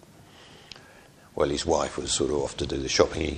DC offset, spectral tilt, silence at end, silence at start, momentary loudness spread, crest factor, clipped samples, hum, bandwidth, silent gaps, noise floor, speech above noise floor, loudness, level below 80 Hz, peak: under 0.1%; -3.5 dB/octave; 0 s; 0.2 s; 22 LU; 26 dB; under 0.1%; none; 11.5 kHz; none; -52 dBFS; 26 dB; -26 LUFS; -44 dBFS; -4 dBFS